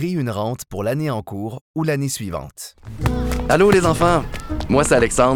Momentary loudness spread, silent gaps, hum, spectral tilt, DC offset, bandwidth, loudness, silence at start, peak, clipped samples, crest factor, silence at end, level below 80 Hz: 15 LU; 1.61-1.74 s; none; -5.5 dB/octave; under 0.1%; 19.5 kHz; -19 LUFS; 0 s; -2 dBFS; under 0.1%; 16 dB; 0 s; -32 dBFS